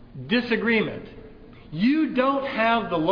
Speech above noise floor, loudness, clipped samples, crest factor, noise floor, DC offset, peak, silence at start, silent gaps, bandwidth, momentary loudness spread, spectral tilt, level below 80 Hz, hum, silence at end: 22 dB; -23 LUFS; under 0.1%; 16 dB; -45 dBFS; under 0.1%; -8 dBFS; 0 s; none; 5.4 kHz; 13 LU; -8 dB/octave; -52 dBFS; none; 0 s